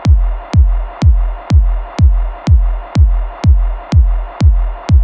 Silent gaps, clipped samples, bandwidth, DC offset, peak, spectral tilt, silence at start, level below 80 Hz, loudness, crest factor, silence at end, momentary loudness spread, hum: none; under 0.1%; 7.4 kHz; under 0.1%; 0 dBFS; -8 dB/octave; 0 s; -12 dBFS; -14 LUFS; 10 dB; 0 s; 4 LU; none